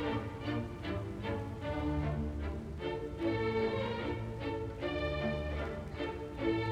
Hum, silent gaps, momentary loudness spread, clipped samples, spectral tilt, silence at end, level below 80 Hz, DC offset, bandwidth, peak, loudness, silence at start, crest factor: none; none; 6 LU; under 0.1%; -7.5 dB/octave; 0 s; -46 dBFS; under 0.1%; 11.5 kHz; -20 dBFS; -37 LUFS; 0 s; 16 dB